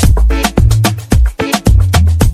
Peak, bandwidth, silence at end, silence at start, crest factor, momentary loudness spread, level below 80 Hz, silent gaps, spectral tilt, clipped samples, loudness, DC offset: 0 dBFS; 15.5 kHz; 0 s; 0 s; 8 dB; 3 LU; -12 dBFS; none; -5.5 dB/octave; under 0.1%; -11 LUFS; under 0.1%